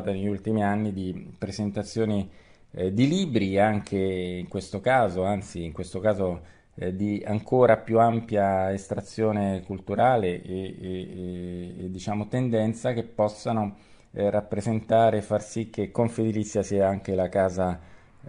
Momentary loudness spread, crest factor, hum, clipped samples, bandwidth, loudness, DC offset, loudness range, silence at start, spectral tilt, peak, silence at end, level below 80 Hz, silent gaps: 13 LU; 20 dB; none; under 0.1%; 10.5 kHz; -26 LUFS; under 0.1%; 4 LU; 0 s; -7 dB/octave; -6 dBFS; 0 s; -54 dBFS; none